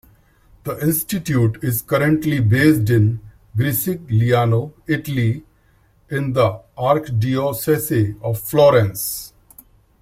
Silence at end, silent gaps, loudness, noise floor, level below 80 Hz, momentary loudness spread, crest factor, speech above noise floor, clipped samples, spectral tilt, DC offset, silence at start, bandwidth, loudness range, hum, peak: 0.75 s; none; -18 LUFS; -56 dBFS; -48 dBFS; 10 LU; 16 dB; 38 dB; under 0.1%; -6.5 dB/octave; under 0.1%; 0.65 s; 16.5 kHz; 3 LU; none; -2 dBFS